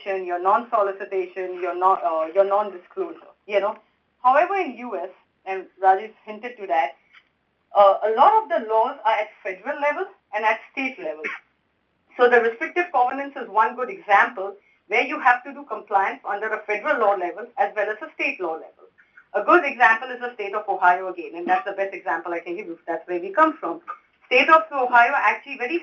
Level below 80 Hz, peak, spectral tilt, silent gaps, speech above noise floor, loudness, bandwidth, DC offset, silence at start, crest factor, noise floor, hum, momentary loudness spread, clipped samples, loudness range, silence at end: -74 dBFS; -2 dBFS; -4 dB/octave; none; 47 dB; -22 LUFS; 7.2 kHz; under 0.1%; 0 s; 20 dB; -69 dBFS; none; 15 LU; under 0.1%; 4 LU; 0 s